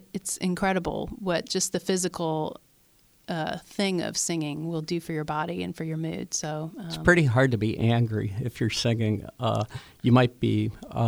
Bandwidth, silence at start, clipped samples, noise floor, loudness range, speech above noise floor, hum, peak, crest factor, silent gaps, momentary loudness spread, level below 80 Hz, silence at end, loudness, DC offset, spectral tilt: over 20 kHz; 0.15 s; under 0.1%; -61 dBFS; 5 LU; 35 dB; none; -4 dBFS; 22 dB; none; 11 LU; -50 dBFS; 0 s; -27 LUFS; under 0.1%; -5 dB/octave